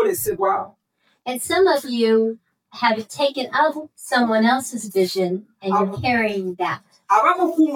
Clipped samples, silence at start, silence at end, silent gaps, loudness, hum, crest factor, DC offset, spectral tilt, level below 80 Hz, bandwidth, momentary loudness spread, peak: under 0.1%; 0 s; 0 s; none; -20 LUFS; none; 16 dB; under 0.1%; -4.5 dB/octave; -60 dBFS; 18 kHz; 10 LU; -4 dBFS